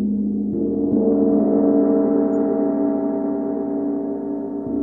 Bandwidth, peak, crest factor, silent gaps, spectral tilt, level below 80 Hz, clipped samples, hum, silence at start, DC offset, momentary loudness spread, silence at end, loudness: 2.1 kHz; -6 dBFS; 12 dB; none; -13 dB/octave; -52 dBFS; under 0.1%; none; 0 s; 0.1%; 8 LU; 0 s; -20 LUFS